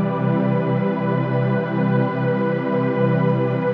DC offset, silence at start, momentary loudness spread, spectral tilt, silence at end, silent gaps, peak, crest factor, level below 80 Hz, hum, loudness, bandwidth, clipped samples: under 0.1%; 0 s; 2 LU; -10.5 dB/octave; 0 s; none; -6 dBFS; 12 dB; -74 dBFS; none; -20 LUFS; 5.2 kHz; under 0.1%